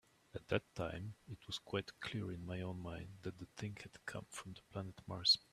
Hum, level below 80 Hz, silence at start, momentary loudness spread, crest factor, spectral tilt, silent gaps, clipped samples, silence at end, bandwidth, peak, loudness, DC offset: none; -68 dBFS; 0.35 s; 12 LU; 26 dB; -4 dB/octave; none; under 0.1%; 0.15 s; 14 kHz; -18 dBFS; -43 LUFS; under 0.1%